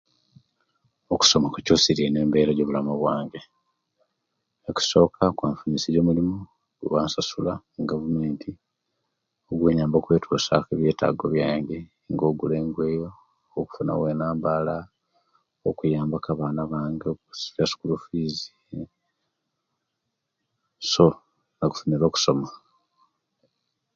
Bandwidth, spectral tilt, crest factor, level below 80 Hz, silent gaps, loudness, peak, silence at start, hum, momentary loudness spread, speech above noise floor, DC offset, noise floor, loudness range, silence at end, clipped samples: 7.8 kHz; -5 dB/octave; 24 dB; -52 dBFS; none; -24 LUFS; -2 dBFS; 1.1 s; none; 14 LU; 57 dB; under 0.1%; -80 dBFS; 7 LU; 1.4 s; under 0.1%